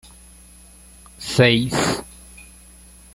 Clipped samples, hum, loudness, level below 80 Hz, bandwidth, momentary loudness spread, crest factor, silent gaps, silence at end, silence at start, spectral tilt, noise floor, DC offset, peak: under 0.1%; none; -18 LUFS; -46 dBFS; 16 kHz; 26 LU; 22 dB; none; 0.7 s; 1.2 s; -4.5 dB/octave; -46 dBFS; under 0.1%; 0 dBFS